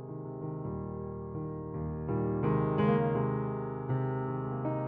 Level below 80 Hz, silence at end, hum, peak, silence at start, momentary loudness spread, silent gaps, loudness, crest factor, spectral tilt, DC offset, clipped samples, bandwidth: -52 dBFS; 0 s; none; -16 dBFS; 0 s; 11 LU; none; -33 LUFS; 16 dB; -9 dB/octave; under 0.1%; under 0.1%; 3.7 kHz